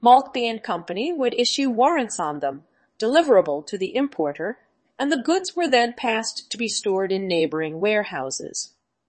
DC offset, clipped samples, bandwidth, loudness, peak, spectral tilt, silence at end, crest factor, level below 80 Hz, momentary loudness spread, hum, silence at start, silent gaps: under 0.1%; under 0.1%; 8.8 kHz; -22 LUFS; -4 dBFS; -3 dB/octave; 0.45 s; 18 dB; -72 dBFS; 10 LU; none; 0 s; none